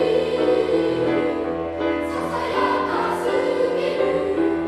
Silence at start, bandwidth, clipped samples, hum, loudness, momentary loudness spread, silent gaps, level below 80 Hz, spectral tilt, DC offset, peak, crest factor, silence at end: 0 s; 13.5 kHz; under 0.1%; none; -21 LUFS; 5 LU; none; -48 dBFS; -6 dB/octave; under 0.1%; -8 dBFS; 14 dB; 0 s